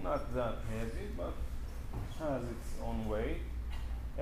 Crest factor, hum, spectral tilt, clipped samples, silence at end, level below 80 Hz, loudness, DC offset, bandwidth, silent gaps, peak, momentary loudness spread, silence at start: 14 dB; none; -7 dB/octave; under 0.1%; 0 s; -40 dBFS; -40 LUFS; under 0.1%; 15.5 kHz; none; -22 dBFS; 7 LU; 0 s